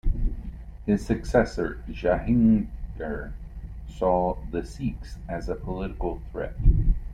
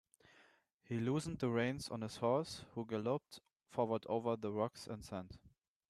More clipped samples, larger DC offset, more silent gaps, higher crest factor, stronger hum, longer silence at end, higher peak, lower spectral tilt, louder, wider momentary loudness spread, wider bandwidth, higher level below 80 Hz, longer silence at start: neither; neither; second, none vs 3.56-3.60 s; about the same, 20 dB vs 20 dB; neither; second, 0 s vs 0.4 s; first, -6 dBFS vs -22 dBFS; first, -8.5 dB/octave vs -6 dB/octave; first, -27 LUFS vs -40 LUFS; first, 17 LU vs 12 LU; second, 9.8 kHz vs 13.5 kHz; first, -30 dBFS vs -70 dBFS; second, 0.05 s vs 0.9 s